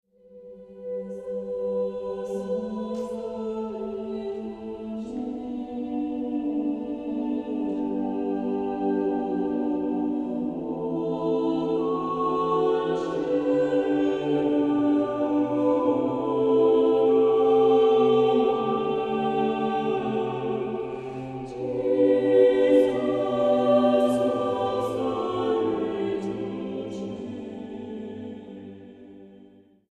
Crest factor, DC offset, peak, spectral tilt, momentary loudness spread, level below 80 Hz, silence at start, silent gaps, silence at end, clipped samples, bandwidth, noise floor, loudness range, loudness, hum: 18 dB; under 0.1%; -8 dBFS; -7.5 dB/octave; 14 LU; -60 dBFS; 0.3 s; none; 0.55 s; under 0.1%; 10 kHz; -53 dBFS; 11 LU; -25 LUFS; none